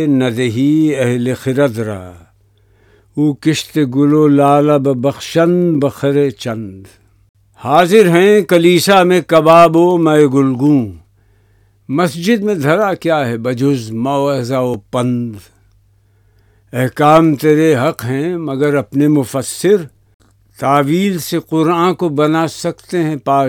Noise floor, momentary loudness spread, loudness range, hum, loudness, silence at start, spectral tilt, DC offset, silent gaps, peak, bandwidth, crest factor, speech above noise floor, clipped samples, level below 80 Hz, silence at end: -52 dBFS; 10 LU; 7 LU; none; -13 LUFS; 0 s; -6 dB/octave; under 0.1%; 7.29-7.34 s, 20.14-20.19 s; 0 dBFS; 17.5 kHz; 14 dB; 40 dB; 0.3%; -52 dBFS; 0 s